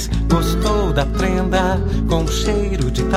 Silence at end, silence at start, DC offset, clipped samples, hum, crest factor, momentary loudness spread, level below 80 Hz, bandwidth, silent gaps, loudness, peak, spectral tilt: 0 s; 0 s; under 0.1%; under 0.1%; none; 14 dB; 2 LU; -22 dBFS; 15.5 kHz; none; -18 LUFS; -2 dBFS; -5.5 dB/octave